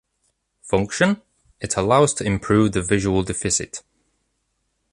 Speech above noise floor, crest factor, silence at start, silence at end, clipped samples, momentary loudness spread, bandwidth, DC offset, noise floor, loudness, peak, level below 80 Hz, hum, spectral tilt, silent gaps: 52 dB; 20 dB; 0.65 s; 1.15 s; under 0.1%; 11 LU; 11.5 kHz; under 0.1%; -72 dBFS; -20 LUFS; -2 dBFS; -42 dBFS; none; -4.5 dB/octave; none